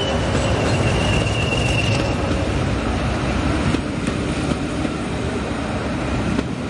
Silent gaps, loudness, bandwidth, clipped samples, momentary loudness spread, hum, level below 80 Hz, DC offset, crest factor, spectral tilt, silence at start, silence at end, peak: none; -21 LUFS; 11.5 kHz; under 0.1%; 5 LU; none; -30 dBFS; under 0.1%; 16 dB; -5.5 dB/octave; 0 s; 0 s; -4 dBFS